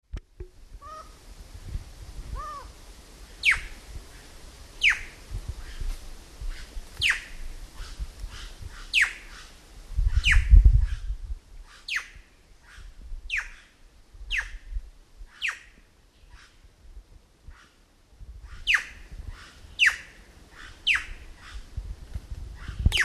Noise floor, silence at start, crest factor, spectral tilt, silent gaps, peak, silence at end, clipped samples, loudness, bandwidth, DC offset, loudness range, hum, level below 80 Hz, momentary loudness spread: -58 dBFS; 0.15 s; 26 dB; -2.5 dB/octave; none; -4 dBFS; 0 s; under 0.1%; -25 LUFS; 13 kHz; under 0.1%; 12 LU; none; -30 dBFS; 25 LU